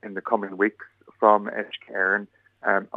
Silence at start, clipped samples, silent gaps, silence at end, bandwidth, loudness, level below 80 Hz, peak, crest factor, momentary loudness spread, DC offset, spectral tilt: 0.05 s; under 0.1%; none; 0.1 s; 7 kHz; -24 LUFS; -82 dBFS; -2 dBFS; 22 dB; 11 LU; under 0.1%; -7 dB/octave